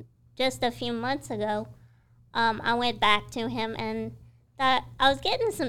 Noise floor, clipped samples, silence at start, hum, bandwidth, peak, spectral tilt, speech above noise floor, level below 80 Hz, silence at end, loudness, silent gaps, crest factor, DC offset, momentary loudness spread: -58 dBFS; under 0.1%; 0 s; none; 18 kHz; -8 dBFS; -4 dB/octave; 31 dB; -54 dBFS; 0 s; -27 LUFS; none; 20 dB; 0.3%; 10 LU